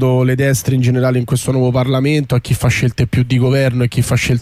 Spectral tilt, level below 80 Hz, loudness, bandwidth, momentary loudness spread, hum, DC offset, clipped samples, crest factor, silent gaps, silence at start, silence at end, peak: -6 dB/octave; -36 dBFS; -14 LUFS; 15 kHz; 3 LU; none; under 0.1%; under 0.1%; 10 dB; none; 0 s; 0 s; -4 dBFS